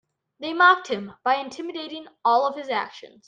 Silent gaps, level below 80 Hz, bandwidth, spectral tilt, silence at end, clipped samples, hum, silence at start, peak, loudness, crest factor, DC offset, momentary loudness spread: none; -76 dBFS; 9.2 kHz; -3.5 dB/octave; 0.2 s; under 0.1%; none; 0.4 s; -4 dBFS; -23 LUFS; 20 dB; under 0.1%; 17 LU